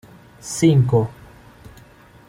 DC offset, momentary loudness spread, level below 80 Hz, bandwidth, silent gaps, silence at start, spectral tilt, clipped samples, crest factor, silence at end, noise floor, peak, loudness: under 0.1%; 15 LU; -50 dBFS; 15.5 kHz; none; 0.45 s; -6.5 dB/octave; under 0.1%; 18 dB; 0.6 s; -47 dBFS; -4 dBFS; -18 LUFS